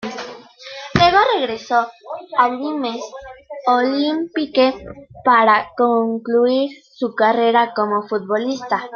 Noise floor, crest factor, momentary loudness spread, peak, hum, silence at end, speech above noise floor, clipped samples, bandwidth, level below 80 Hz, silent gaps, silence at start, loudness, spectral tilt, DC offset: -36 dBFS; 18 dB; 19 LU; 0 dBFS; none; 0 s; 19 dB; under 0.1%; 7 kHz; -52 dBFS; none; 0 s; -17 LUFS; -5.5 dB/octave; under 0.1%